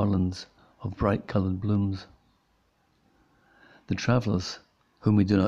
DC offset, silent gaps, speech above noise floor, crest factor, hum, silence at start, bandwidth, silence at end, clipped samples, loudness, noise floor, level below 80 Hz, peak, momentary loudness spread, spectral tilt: under 0.1%; none; 43 dB; 20 dB; none; 0 s; 7.6 kHz; 0 s; under 0.1%; -28 LUFS; -68 dBFS; -50 dBFS; -8 dBFS; 14 LU; -7.5 dB/octave